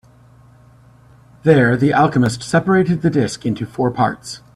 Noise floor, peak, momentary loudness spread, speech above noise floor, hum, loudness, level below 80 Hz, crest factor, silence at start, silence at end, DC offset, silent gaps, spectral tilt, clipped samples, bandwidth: -47 dBFS; 0 dBFS; 8 LU; 31 dB; none; -16 LUFS; -50 dBFS; 18 dB; 1.45 s; 0.2 s; under 0.1%; none; -6.5 dB/octave; under 0.1%; 12.5 kHz